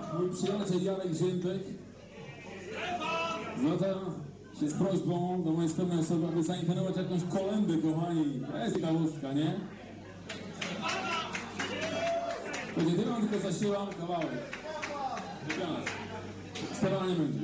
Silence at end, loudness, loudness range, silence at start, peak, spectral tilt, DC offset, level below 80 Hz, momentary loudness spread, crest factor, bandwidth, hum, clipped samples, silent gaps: 0 s; -33 LUFS; 4 LU; 0 s; -18 dBFS; -6 dB/octave; under 0.1%; -64 dBFS; 12 LU; 14 dB; 8 kHz; none; under 0.1%; none